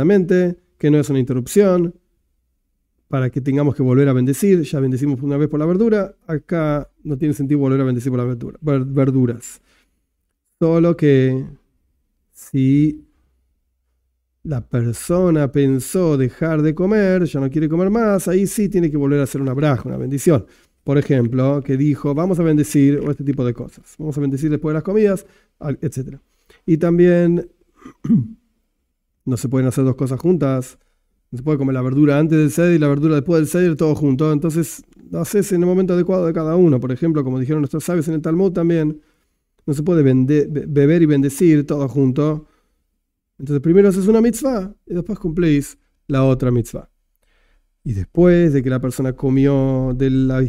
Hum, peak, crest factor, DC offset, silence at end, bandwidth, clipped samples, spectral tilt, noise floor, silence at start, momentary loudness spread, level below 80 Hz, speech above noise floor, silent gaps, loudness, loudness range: none; 0 dBFS; 18 dB; under 0.1%; 0 s; 16 kHz; under 0.1%; -8 dB/octave; -72 dBFS; 0 s; 11 LU; -42 dBFS; 56 dB; none; -17 LUFS; 4 LU